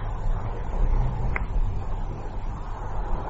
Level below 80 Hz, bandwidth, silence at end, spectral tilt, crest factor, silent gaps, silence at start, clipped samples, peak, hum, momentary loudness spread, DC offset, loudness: -26 dBFS; 4.3 kHz; 0 s; -7 dB/octave; 14 dB; none; 0 s; under 0.1%; -10 dBFS; none; 8 LU; under 0.1%; -31 LUFS